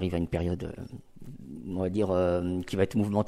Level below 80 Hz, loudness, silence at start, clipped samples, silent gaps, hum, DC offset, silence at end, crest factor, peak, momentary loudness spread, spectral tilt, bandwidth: -48 dBFS; -29 LUFS; 0 s; under 0.1%; none; none; under 0.1%; 0 s; 18 dB; -12 dBFS; 19 LU; -8 dB/octave; 14.5 kHz